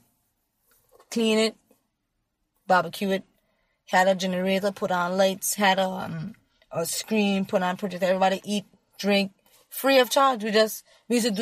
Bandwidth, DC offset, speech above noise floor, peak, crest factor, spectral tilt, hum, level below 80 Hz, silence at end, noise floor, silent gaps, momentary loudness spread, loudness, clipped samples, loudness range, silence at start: 15.5 kHz; under 0.1%; 53 dB; -6 dBFS; 18 dB; -4 dB/octave; none; -70 dBFS; 0 s; -77 dBFS; none; 11 LU; -24 LUFS; under 0.1%; 4 LU; 1.1 s